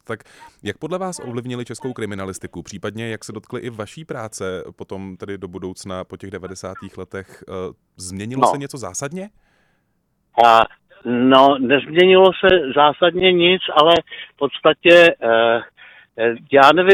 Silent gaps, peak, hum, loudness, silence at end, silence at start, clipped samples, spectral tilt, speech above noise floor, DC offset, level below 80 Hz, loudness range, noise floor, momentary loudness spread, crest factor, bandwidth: none; 0 dBFS; none; -15 LUFS; 0 s; 0.1 s; under 0.1%; -4.5 dB/octave; 50 dB; under 0.1%; -52 dBFS; 17 LU; -67 dBFS; 21 LU; 18 dB; 13.5 kHz